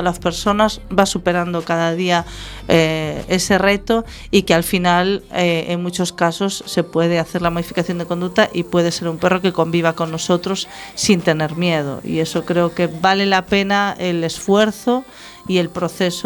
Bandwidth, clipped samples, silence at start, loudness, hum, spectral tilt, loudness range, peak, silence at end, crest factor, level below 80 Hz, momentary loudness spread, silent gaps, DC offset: 19.5 kHz; under 0.1%; 0 s; -18 LUFS; none; -4.5 dB/octave; 2 LU; 0 dBFS; 0 s; 18 dB; -42 dBFS; 7 LU; none; under 0.1%